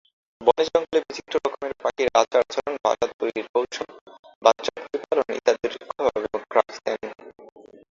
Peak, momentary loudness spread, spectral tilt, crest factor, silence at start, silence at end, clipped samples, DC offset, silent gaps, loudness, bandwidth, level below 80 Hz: -2 dBFS; 10 LU; -3 dB/octave; 22 dB; 0.4 s; 0.5 s; under 0.1%; under 0.1%; 3.14-3.19 s, 3.49-3.54 s, 4.01-4.06 s, 4.19-4.23 s, 4.35-4.41 s; -24 LUFS; 7.6 kHz; -62 dBFS